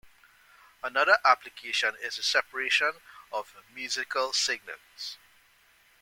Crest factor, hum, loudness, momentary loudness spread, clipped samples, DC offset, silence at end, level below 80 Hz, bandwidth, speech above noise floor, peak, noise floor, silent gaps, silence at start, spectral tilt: 24 dB; none; -27 LUFS; 17 LU; under 0.1%; under 0.1%; 0.85 s; -74 dBFS; 17 kHz; 34 dB; -6 dBFS; -62 dBFS; none; 0.85 s; 1.5 dB/octave